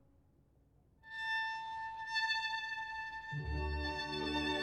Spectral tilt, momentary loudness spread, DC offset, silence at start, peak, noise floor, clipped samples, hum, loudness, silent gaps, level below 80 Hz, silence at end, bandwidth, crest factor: -4.5 dB/octave; 8 LU; under 0.1%; 1.05 s; -24 dBFS; -69 dBFS; under 0.1%; none; -38 LUFS; none; -50 dBFS; 0 s; 12 kHz; 16 dB